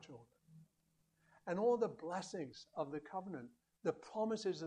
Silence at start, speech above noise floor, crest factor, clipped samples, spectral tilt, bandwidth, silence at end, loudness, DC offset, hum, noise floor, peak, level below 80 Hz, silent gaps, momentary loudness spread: 0 s; 39 dB; 18 dB; under 0.1%; -5.5 dB/octave; 10 kHz; 0 s; -42 LUFS; under 0.1%; none; -80 dBFS; -24 dBFS; -84 dBFS; none; 17 LU